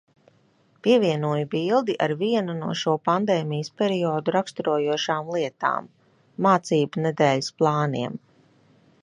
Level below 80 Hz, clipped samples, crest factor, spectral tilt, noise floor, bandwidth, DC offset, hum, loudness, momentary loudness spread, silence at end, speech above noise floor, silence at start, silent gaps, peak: -72 dBFS; under 0.1%; 20 dB; -6 dB/octave; -61 dBFS; 10.5 kHz; under 0.1%; none; -24 LUFS; 7 LU; 0.85 s; 39 dB; 0.85 s; none; -4 dBFS